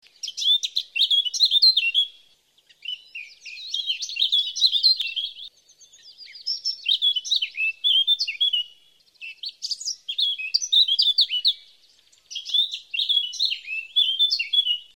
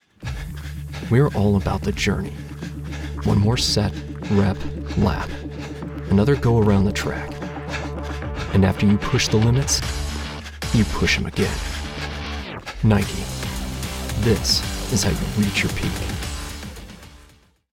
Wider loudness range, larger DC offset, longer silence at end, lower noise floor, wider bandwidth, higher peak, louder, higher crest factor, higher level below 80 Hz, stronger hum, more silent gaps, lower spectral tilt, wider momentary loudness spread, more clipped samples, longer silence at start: about the same, 2 LU vs 3 LU; neither; second, 0.15 s vs 0.5 s; first, -60 dBFS vs -52 dBFS; about the same, 17 kHz vs 17 kHz; about the same, -6 dBFS vs -4 dBFS; about the same, -20 LUFS vs -22 LUFS; about the same, 18 dB vs 18 dB; second, -80 dBFS vs -32 dBFS; neither; neither; second, 6.5 dB/octave vs -5 dB/octave; first, 17 LU vs 14 LU; neither; about the same, 0.25 s vs 0.2 s